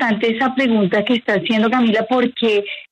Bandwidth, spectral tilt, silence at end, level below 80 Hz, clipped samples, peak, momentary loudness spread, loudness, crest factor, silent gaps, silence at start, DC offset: 8.4 kHz; -6.5 dB/octave; 0.1 s; -60 dBFS; under 0.1%; -4 dBFS; 3 LU; -17 LUFS; 12 dB; none; 0 s; under 0.1%